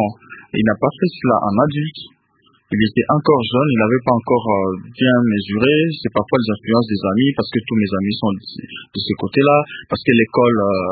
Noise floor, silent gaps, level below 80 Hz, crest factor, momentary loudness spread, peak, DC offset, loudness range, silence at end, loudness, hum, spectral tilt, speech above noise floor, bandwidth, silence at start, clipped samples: -58 dBFS; none; -48 dBFS; 16 dB; 9 LU; 0 dBFS; under 0.1%; 3 LU; 0 s; -17 LUFS; none; -10.5 dB/octave; 41 dB; 4.8 kHz; 0 s; under 0.1%